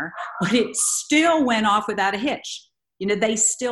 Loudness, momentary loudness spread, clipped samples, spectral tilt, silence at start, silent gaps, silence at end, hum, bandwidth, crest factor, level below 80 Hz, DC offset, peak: -20 LUFS; 12 LU; under 0.1%; -2.5 dB/octave; 0 s; none; 0 s; none; 13 kHz; 16 dB; -62 dBFS; under 0.1%; -6 dBFS